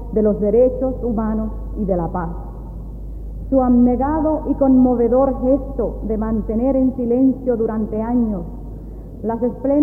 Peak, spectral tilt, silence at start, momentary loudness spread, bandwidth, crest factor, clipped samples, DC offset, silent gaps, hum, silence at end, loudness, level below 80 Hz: -4 dBFS; -12.5 dB/octave; 0 s; 18 LU; 2.5 kHz; 14 dB; under 0.1%; under 0.1%; none; none; 0 s; -18 LUFS; -30 dBFS